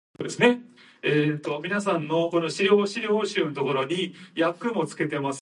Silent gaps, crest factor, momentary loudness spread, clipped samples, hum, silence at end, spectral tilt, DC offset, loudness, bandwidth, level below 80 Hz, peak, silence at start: none; 20 dB; 8 LU; under 0.1%; none; 0.05 s; -5 dB/octave; under 0.1%; -25 LUFS; 11.5 kHz; -74 dBFS; -6 dBFS; 0.2 s